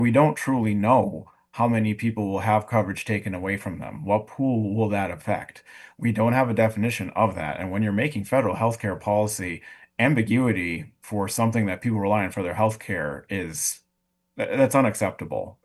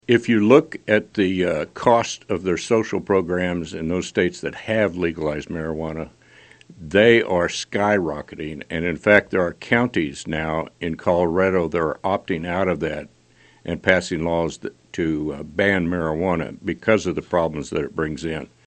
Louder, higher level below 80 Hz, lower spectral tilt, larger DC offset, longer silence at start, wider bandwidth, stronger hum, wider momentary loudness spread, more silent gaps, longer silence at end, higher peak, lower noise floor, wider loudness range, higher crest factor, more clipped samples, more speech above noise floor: second, -24 LUFS vs -21 LUFS; second, -56 dBFS vs -48 dBFS; about the same, -6 dB/octave vs -5.5 dB/octave; neither; about the same, 0 s vs 0.1 s; first, 12.5 kHz vs 8.8 kHz; neither; about the same, 10 LU vs 12 LU; neither; about the same, 0.15 s vs 0.2 s; second, -6 dBFS vs 0 dBFS; first, -75 dBFS vs -50 dBFS; about the same, 2 LU vs 4 LU; about the same, 18 dB vs 22 dB; neither; first, 51 dB vs 29 dB